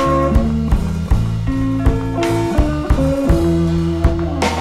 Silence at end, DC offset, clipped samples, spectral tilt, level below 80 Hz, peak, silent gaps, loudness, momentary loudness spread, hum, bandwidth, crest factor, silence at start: 0 s; under 0.1%; under 0.1%; -7.5 dB/octave; -20 dBFS; -2 dBFS; none; -17 LUFS; 4 LU; none; 13.5 kHz; 14 dB; 0 s